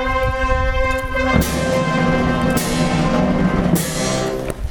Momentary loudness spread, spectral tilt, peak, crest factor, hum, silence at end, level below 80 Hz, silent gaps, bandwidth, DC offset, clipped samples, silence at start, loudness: 3 LU; -5.5 dB/octave; -2 dBFS; 16 dB; none; 0 s; -26 dBFS; none; over 20 kHz; under 0.1%; under 0.1%; 0 s; -18 LUFS